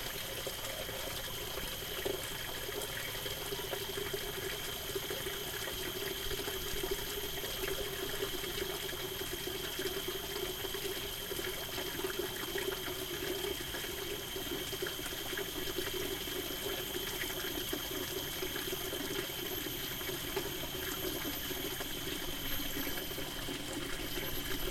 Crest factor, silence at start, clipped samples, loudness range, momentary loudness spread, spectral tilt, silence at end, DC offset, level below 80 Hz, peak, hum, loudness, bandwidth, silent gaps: 16 dB; 0 s; under 0.1%; 1 LU; 2 LU; -2.5 dB/octave; 0 s; under 0.1%; -52 dBFS; -22 dBFS; none; -37 LUFS; 16.5 kHz; none